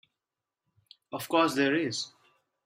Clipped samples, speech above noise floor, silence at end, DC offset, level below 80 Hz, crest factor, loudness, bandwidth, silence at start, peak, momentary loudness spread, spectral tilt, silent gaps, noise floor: under 0.1%; 62 dB; 0.6 s; under 0.1%; -78 dBFS; 20 dB; -28 LUFS; 16 kHz; 1.1 s; -12 dBFS; 15 LU; -4 dB/octave; none; -89 dBFS